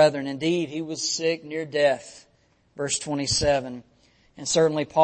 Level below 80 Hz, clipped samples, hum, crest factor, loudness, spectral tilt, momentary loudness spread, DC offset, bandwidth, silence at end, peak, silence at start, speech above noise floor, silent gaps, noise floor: -52 dBFS; under 0.1%; none; 18 dB; -25 LUFS; -3.5 dB/octave; 12 LU; under 0.1%; 8.8 kHz; 0 s; -6 dBFS; 0 s; 36 dB; none; -60 dBFS